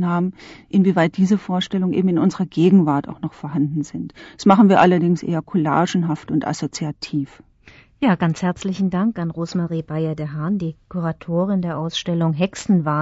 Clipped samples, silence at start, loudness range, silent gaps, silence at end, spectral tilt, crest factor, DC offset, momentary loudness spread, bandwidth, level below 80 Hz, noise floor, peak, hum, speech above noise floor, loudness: under 0.1%; 0 s; 6 LU; none; 0 s; -7 dB/octave; 16 dB; under 0.1%; 11 LU; 8 kHz; -54 dBFS; -49 dBFS; -2 dBFS; none; 30 dB; -20 LUFS